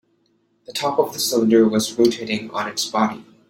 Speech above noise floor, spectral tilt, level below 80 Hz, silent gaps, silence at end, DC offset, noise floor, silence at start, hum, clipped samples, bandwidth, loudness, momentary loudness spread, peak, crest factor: 45 dB; -4 dB/octave; -62 dBFS; none; 0.25 s; under 0.1%; -64 dBFS; 0.7 s; none; under 0.1%; 16.5 kHz; -20 LUFS; 10 LU; -4 dBFS; 18 dB